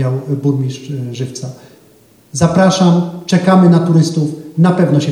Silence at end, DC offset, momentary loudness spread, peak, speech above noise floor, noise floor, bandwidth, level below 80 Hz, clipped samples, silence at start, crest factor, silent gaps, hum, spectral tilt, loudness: 0 s; under 0.1%; 14 LU; 0 dBFS; 34 dB; -47 dBFS; 11 kHz; -50 dBFS; under 0.1%; 0 s; 12 dB; none; none; -6.5 dB/octave; -13 LUFS